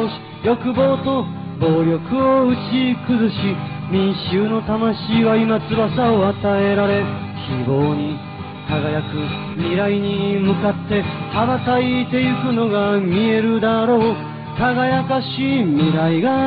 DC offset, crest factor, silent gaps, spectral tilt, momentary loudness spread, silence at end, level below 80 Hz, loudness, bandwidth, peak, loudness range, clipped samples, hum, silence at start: under 0.1%; 12 dB; none; -5.5 dB/octave; 7 LU; 0 s; -48 dBFS; -18 LUFS; 5 kHz; -6 dBFS; 3 LU; under 0.1%; none; 0 s